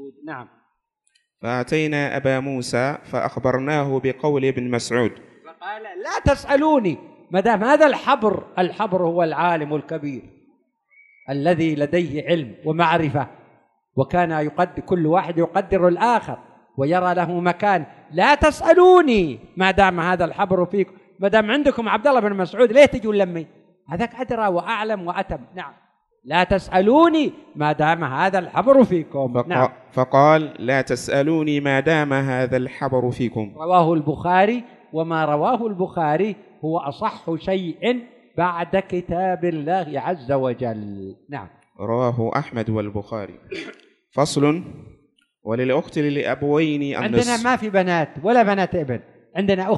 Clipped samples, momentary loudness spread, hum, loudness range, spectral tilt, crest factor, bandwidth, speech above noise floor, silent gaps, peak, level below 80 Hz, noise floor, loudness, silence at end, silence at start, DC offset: under 0.1%; 14 LU; none; 7 LU; -6 dB/octave; 20 dB; 12 kHz; 50 dB; none; 0 dBFS; -46 dBFS; -69 dBFS; -20 LUFS; 0 s; 0 s; under 0.1%